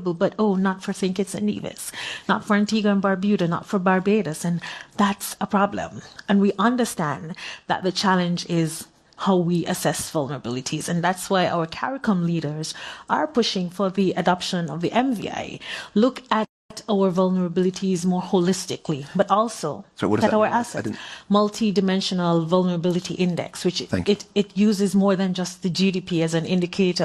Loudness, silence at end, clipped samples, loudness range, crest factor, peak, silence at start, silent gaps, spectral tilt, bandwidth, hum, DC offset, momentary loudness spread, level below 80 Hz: -23 LUFS; 0 s; under 0.1%; 2 LU; 18 dB; -4 dBFS; 0 s; 16.49-16.69 s; -5.5 dB/octave; 13 kHz; none; under 0.1%; 9 LU; -60 dBFS